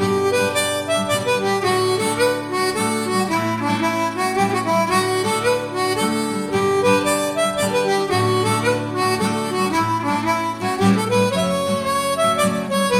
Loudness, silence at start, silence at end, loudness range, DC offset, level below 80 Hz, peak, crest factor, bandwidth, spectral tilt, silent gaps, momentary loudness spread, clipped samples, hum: -19 LUFS; 0 s; 0 s; 1 LU; under 0.1%; -54 dBFS; -2 dBFS; 16 dB; 16.5 kHz; -4.5 dB/octave; none; 3 LU; under 0.1%; none